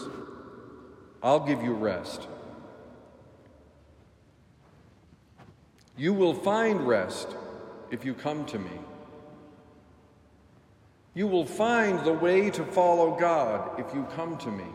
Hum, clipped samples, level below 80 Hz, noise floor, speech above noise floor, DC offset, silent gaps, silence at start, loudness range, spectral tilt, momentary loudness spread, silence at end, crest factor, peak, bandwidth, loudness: none; under 0.1%; -66 dBFS; -59 dBFS; 32 dB; under 0.1%; none; 0 s; 13 LU; -6 dB/octave; 23 LU; 0 s; 20 dB; -10 dBFS; 15 kHz; -27 LUFS